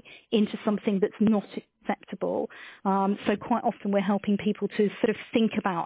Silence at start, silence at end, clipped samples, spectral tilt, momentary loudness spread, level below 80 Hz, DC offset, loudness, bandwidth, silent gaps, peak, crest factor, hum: 0.05 s; 0 s; under 0.1%; -11 dB/octave; 8 LU; -66 dBFS; under 0.1%; -27 LUFS; 4 kHz; none; -10 dBFS; 18 dB; none